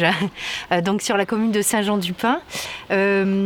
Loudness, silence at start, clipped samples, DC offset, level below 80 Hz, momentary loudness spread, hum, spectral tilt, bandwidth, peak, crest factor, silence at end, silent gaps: -21 LUFS; 0 s; under 0.1%; under 0.1%; -56 dBFS; 6 LU; none; -4 dB/octave; over 20 kHz; -2 dBFS; 18 dB; 0 s; none